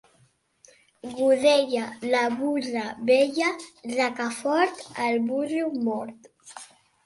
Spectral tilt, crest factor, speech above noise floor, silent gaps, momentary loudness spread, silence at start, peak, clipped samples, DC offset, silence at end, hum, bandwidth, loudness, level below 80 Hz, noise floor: -3.5 dB/octave; 18 dB; 39 dB; none; 19 LU; 1.05 s; -8 dBFS; under 0.1%; under 0.1%; 0.4 s; none; 11.5 kHz; -25 LUFS; -72 dBFS; -64 dBFS